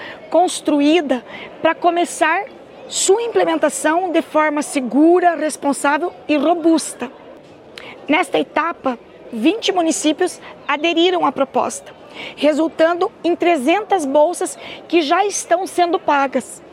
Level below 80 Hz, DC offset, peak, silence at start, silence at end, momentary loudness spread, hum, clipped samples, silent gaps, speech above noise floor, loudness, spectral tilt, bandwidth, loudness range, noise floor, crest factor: -64 dBFS; under 0.1%; -2 dBFS; 0 s; 0.05 s; 11 LU; none; under 0.1%; none; 23 dB; -17 LUFS; -2.5 dB/octave; 15 kHz; 3 LU; -40 dBFS; 14 dB